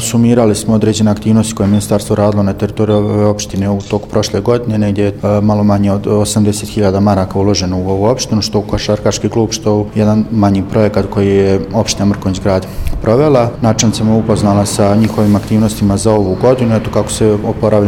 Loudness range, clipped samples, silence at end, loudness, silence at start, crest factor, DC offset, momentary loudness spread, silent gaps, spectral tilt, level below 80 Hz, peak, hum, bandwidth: 2 LU; under 0.1%; 0 s; -12 LUFS; 0 s; 12 dB; under 0.1%; 4 LU; none; -6 dB/octave; -30 dBFS; 0 dBFS; none; 16 kHz